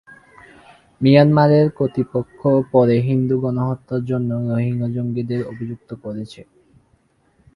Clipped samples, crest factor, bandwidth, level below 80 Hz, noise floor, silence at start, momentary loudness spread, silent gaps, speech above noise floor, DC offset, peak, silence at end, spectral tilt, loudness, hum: under 0.1%; 18 dB; 10.5 kHz; -54 dBFS; -60 dBFS; 1 s; 17 LU; none; 42 dB; under 0.1%; 0 dBFS; 1.15 s; -9.5 dB/octave; -18 LUFS; none